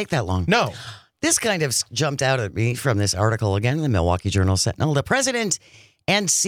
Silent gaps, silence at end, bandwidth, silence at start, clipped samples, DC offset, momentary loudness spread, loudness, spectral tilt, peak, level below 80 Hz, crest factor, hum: none; 0 s; 16 kHz; 0 s; under 0.1%; under 0.1%; 5 LU; -21 LUFS; -4 dB/octave; -4 dBFS; -48 dBFS; 16 dB; none